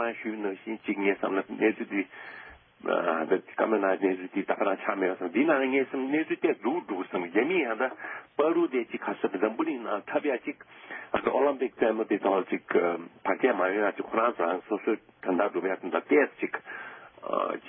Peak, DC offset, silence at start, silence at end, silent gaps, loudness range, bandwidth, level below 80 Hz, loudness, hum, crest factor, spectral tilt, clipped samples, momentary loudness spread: -10 dBFS; under 0.1%; 0 s; 0 s; none; 2 LU; 3.7 kHz; -72 dBFS; -28 LUFS; none; 18 dB; -9.5 dB/octave; under 0.1%; 9 LU